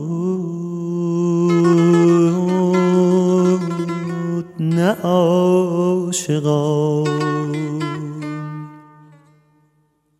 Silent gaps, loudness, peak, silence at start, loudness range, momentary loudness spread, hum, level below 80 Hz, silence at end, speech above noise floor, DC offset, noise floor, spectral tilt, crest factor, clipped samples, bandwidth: none; -17 LUFS; -2 dBFS; 0 s; 6 LU; 12 LU; none; -64 dBFS; 1.4 s; 46 dB; under 0.1%; -62 dBFS; -7 dB/octave; 16 dB; under 0.1%; 12.5 kHz